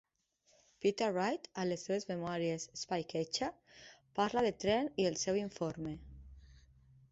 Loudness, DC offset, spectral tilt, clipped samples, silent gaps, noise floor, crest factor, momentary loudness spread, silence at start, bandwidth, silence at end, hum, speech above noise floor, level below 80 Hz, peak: -37 LUFS; under 0.1%; -4 dB/octave; under 0.1%; none; -75 dBFS; 18 dB; 14 LU; 0.8 s; 8 kHz; 0.6 s; none; 39 dB; -64 dBFS; -20 dBFS